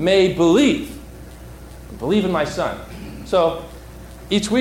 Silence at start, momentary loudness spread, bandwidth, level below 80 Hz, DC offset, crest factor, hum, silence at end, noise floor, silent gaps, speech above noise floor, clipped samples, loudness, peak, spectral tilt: 0 s; 24 LU; 16.5 kHz; -40 dBFS; under 0.1%; 14 dB; none; 0 s; -37 dBFS; none; 20 dB; under 0.1%; -19 LUFS; -6 dBFS; -5.5 dB/octave